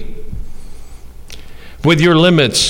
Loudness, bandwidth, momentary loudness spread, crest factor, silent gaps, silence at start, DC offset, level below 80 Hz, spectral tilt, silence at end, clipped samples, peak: -11 LUFS; 16.5 kHz; 23 LU; 14 dB; none; 0 s; under 0.1%; -30 dBFS; -4.5 dB/octave; 0 s; under 0.1%; -2 dBFS